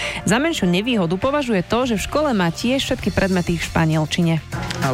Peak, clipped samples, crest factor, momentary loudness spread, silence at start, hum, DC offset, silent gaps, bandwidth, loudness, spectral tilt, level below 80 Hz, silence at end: -4 dBFS; under 0.1%; 16 dB; 2 LU; 0 s; none; under 0.1%; none; 16 kHz; -19 LUFS; -5.5 dB/octave; -38 dBFS; 0 s